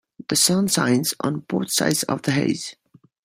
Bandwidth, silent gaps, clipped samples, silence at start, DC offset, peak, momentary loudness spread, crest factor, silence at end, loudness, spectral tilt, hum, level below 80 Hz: 16 kHz; none; under 0.1%; 0.2 s; under 0.1%; -4 dBFS; 9 LU; 18 dB; 0.5 s; -21 LUFS; -3.5 dB/octave; none; -60 dBFS